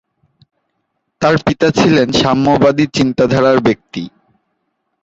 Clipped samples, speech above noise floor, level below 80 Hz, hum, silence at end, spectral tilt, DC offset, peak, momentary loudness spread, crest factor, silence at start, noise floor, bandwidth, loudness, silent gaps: under 0.1%; 57 dB; -44 dBFS; none; 0.95 s; -6 dB/octave; under 0.1%; 0 dBFS; 10 LU; 14 dB; 1.2 s; -69 dBFS; 8 kHz; -12 LUFS; none